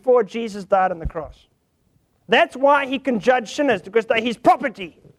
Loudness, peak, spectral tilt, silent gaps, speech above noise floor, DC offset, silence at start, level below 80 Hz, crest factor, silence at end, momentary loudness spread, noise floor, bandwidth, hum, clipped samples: -19 LUFS; -4 dBFS; -5 dB/octave; none; 44 dB; under 0.1%; 0.05 s; -44 dBFS; 18 dB; 0.3 s; 12 LU; -64 dBFS; 12 kHz; none; under 0.1%